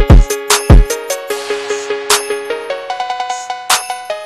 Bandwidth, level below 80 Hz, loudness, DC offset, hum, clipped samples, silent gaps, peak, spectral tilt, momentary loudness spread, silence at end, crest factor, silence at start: 14 kHz; -16 dBFS; -14 LUFS; under 0.1%; none; 1%; none; 0 dBFS; -4 dB/octave; 11 LU; 0 s; 12 dB; 0 s